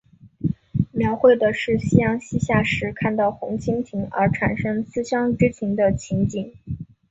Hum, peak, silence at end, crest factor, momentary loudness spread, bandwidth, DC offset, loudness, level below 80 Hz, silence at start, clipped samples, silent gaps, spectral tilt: none; -2 dBFS; 0.25 s; 20 dB; 10 LU; 8 kHz; under 0.1%; -21 LUFS; -44 dBFS; 0.25 s; under 0.1%; none; -7 dB/octave